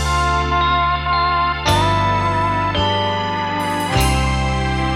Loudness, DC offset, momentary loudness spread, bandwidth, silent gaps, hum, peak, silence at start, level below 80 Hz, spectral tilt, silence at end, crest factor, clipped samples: -17 LUFS; under 0.1%; 4 LU; 16 kHz; none; none; -4 dBFS; 0 s; -26 dBFS; -4.5 dB/octave; 0 s; 14 dB; under 0.1%